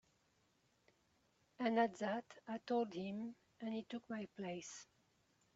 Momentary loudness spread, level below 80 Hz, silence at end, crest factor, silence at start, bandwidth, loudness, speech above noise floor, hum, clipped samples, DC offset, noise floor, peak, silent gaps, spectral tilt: 13 LU; -86 dBFS; 0.7 s; 22 dB; 1.6 s; 8 kHz; -43 LUFS; 36 dB; none; under 0.1%; under 0.1%; -79 dBFS; -22 dBFS; none; -4.5 dB/octave